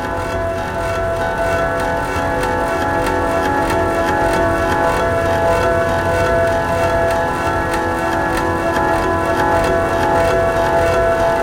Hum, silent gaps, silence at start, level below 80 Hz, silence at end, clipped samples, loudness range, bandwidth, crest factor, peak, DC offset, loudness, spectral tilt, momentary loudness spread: none; none; 0 s; -30 dBFS; 0 s; under 0.1%; 2 LU; 17 kHz; 14 dB; -2 dBFS; 0.4%; -16 LUFS; -5.5 dB/octave; 4 LU